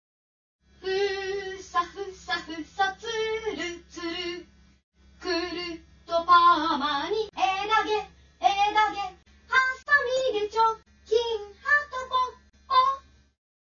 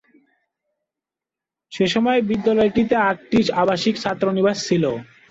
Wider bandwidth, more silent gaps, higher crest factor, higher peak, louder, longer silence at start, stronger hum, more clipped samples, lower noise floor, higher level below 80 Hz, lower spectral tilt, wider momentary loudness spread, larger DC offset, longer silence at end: about the same, 7.4 kHz vs 8 kHz; first, 4.84-4.92 s vs none; about the same, 20 dB vs 16 dB; about the same, -8 dBFS vs -6 dBFS; second, -26 LUFS vs -19 LUFS; second, 0.85 s vs 1.7 s; neither; neither; second, -46 dBFS vs -88 dBFS; about the same, -58 dBFS vs -54 dBFS; second, -2.5 dB/octave vs -5.5 dB/octave; first, 13 LU vs 5 LU; neither; first, 0.7 s vs 0.25 s